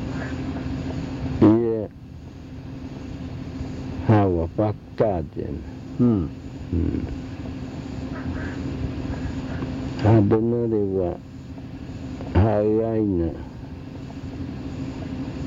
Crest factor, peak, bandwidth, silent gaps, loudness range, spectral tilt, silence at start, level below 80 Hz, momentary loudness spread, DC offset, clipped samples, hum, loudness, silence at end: 18 dB; -6 dBFS; 7.6 kHz; none; 4 LU; -9 dB/octave; 0 s; -40 dBFS; 17 LU; under 0.1%; under 0.1%; none; -24 LUFS; 0 s